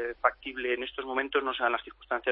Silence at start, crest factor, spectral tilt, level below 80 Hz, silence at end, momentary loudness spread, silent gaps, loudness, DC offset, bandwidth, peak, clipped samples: 0 s; 22 dB; -6.5 dB/octave; -60 dBFS; 0 s; 6 LU; none; -31 LUFS; under 0.1%; 5.4 kHz; -8 dBFS; under 0.1%